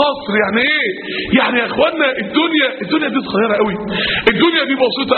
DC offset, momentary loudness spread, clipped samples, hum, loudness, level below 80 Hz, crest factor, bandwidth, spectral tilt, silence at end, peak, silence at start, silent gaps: under 0.1%; 4 LU; under 0.1%; none; -15 LUFS; -46 dBFS; 16 dB; 4.6 kHz; -2 dB/octave; 0 s; 0 dBFS; 0 s; none